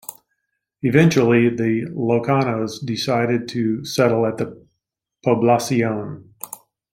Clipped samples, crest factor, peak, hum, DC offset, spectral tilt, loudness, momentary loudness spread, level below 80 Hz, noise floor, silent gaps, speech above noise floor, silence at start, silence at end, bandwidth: under 0.1%; 18 dB; -2 dBFS; none; under 0.1%; -6 dB/octave; -19 LUFS; 19 LU; -58 dBFS; -80 dBFS; none; 61 dB; 0.1 s; 0.35 s; 16.5 kHz